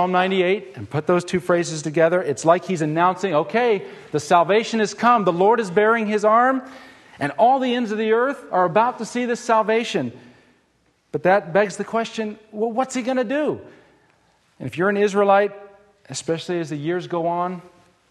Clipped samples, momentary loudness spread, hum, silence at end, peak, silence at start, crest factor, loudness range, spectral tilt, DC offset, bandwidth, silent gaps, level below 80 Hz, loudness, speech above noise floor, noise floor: under 0.1%; 10 LU; none; 0.5 s; -2 dBFS; 0 s; 18 dB; 5 LU; -5 dB/octave; under 0.1%; 12 kHz; none; -66 dBFS; -20 LUFS; 44 dB; -63 dBFS